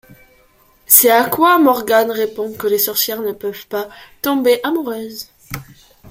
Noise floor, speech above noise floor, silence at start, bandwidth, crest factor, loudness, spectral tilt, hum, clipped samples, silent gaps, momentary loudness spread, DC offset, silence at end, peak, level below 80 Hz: -52 dBFS; 37 dB; 0.9 s; 16.5 kHz; 16 dB; -14 LUFS; -2.5 dB/octave; none; under 0.1%; none; 21 LU; under 0.1%; 0 s; 0 dBFS; -54 dBFS